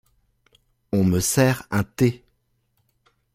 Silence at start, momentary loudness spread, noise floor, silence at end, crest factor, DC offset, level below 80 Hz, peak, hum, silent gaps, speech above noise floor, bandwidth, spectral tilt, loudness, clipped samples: 0.95 s; 8 LU; -69 dBFS; 1.15 s; 22 dB; under 0.1%; -52 dBFS; -2 dBFS; none; none; 49 dB; 16.5 kHz; -5.5 dB/octave; -21 LUFS; under 0.1%